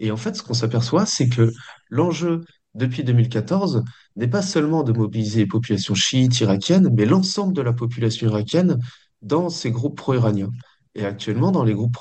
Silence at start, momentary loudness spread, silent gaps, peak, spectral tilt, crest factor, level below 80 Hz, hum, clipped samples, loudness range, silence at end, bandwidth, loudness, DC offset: 0 s; 10 LU; none; -4 dBFS; -6 dB/octave; 16 dB; -58 dBFS; none; under 0.1%; 4 LU; 0 s; 8.6 kHz; -20 LUFS; under 0.1%